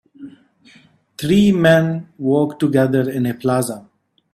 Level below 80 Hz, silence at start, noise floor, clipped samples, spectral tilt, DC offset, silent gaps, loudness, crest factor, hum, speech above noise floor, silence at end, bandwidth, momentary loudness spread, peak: -52 dBFS; 0.2 s; -51 dBFS; under 0.1%; -6.5 dB/octave; under 0.1%; none; -17 LUFS; 18 dB; none; 35 dB; 0.55 s; 14.5 kHz; 11 LU; 0 dBFS